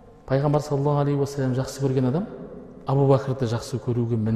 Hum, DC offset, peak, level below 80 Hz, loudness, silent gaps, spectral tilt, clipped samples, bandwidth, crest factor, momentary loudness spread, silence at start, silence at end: none; under 0.1%; -8 dBFS; -50 dBFS; -24 LUFS; none; -8 dB/octave; under 0.1%; 12.5 kHz; 16 dB; 9 LU; 0.05 s; 0 s